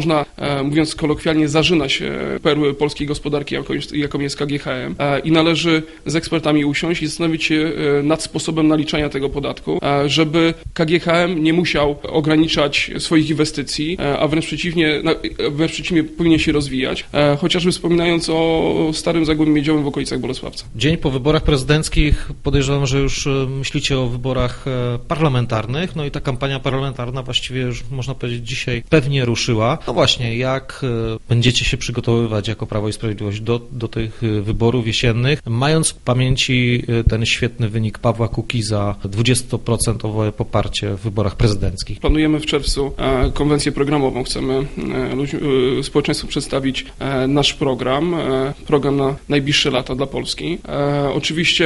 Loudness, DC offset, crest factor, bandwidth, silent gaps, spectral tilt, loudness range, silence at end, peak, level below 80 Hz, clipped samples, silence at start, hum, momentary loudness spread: -18 LUFS; under 0.1%; 18 dB; 11.5 kHz; none; -5 dB/octave; 3 LU; 0 s; 0 dBFS; -32 dBFS; under 0.1%; 0 s; none; 7 LU